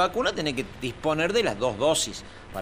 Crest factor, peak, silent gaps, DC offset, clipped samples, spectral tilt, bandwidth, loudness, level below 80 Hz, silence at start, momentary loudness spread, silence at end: 18 dB; -10 dBFS; none; under 0.1%; under 0.1%; -3.5 dB/octave; 15.5 kHz; -26 LUFS; -48 dBFS; 0 s; 10 LU; 0 s